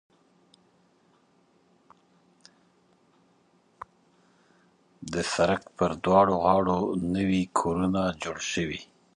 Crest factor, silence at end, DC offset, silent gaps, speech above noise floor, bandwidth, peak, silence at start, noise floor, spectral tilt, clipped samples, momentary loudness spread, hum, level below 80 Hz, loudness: 24 dB; 0.3 s; under 0.1%; none; 39 dB; 11 kHz; -6 dBFS; 5 s; -65 dBFS; -5.5 dB/octave; under 0.1%; 21 LU; none; -54 dBFS; -26 LUFS